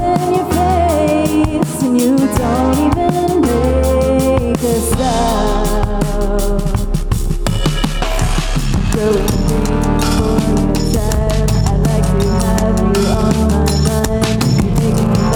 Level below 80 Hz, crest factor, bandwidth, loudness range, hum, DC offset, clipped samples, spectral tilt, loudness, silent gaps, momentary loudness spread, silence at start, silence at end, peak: -20 dBFS; 12 dB; over 20 kHz; 3 LU; none; under 0.1%; under 0.1%; -6 dB/octave; -14 LUFS; none; 4 LU; 0 s; 0 s; -2 dBFS